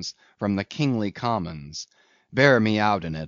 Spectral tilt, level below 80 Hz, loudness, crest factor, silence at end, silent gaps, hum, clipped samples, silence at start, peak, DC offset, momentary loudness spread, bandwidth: -4.5 dB/octave; -54 dBFS; -23 LUFS; 22 dB; 0 s; none; none; under 0.1%; 0 s; -4 dBFS; under 0.1%; 18 LU; 7.4 kHz